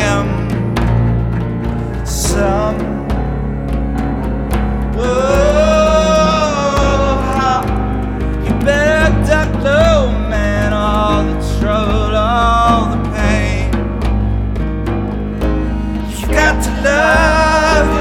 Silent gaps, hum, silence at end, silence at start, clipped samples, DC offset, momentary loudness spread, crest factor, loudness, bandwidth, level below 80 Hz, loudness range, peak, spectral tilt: none; none; 0 s; 0 s; under 0.1%; under 0.1%; 8 LU; 12 dB; -14 LUFS; 15 kHz; -20 dBFS; 4 LU; 0 dBFS; -5.5 dB/octave